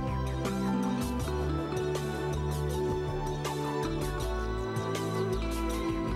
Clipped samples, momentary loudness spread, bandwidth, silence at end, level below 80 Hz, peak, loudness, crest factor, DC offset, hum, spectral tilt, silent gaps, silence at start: under 0.1%; 3 LU; 16 kHz; 0 s; -38 dBFS; -20 dBFS; -32 LUFS; 12 dB; under 0.1%; none; -6 dB/octave; none; 0 s